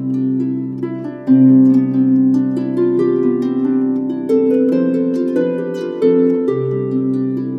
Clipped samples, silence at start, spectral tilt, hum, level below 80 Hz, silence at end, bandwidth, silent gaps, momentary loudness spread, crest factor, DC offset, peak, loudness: under 0.1%; 0 s; -10 dB/octave; none; -64 dBFS; 0 s; 4.7 kHz; none; 9 LU; 12 dB; under 0.1%; -2 dBFS; -15 LUFS